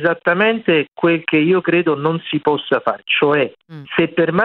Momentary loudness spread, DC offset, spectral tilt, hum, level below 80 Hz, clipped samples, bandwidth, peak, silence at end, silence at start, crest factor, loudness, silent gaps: 5 LU; under 0.1%; -8.5 dB/octave; none; -62 dBFS; under 0.1%; 4.4 kHz; -2 dBFS; 0 s; 0 s; 16 dB; -16 LUFS; none